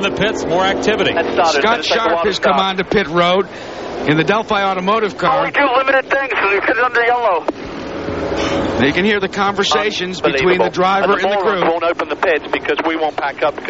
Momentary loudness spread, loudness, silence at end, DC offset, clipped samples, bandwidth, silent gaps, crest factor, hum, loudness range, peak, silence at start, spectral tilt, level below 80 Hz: 6 LU; -15 LUFS; 0 s; 0.2%; under 0.1%; 8 kHz; none; 14 dB; none; 2 LU; -2 dBFS; 0 s; -2.5 dB/octave; -44 dBFS